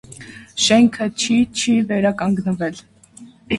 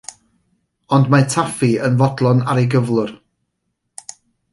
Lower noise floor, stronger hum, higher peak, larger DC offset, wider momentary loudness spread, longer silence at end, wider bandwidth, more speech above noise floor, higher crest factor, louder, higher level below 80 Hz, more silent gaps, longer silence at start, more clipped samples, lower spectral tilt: second, -44 dBFS vs -73 dBFS; neither; about the same, -2 dBFS vs -2 dBFS; neither; second, 15 LU vs 21 LU; second, 0 s vs 1.35 s; about the same, 11.5 kHz vs 11.5 kHz; second, 27 dB vs 58 dB; about the same, 16 dB vs 16 dB; about the same, -17 LUFS vs -16 LUFS; about the same, -52 dBFS vs -56 dBFS; neither; second, 0.1 s vs 0.9 s; neither; second, -4 dB/octave vs -6.5 dB/octave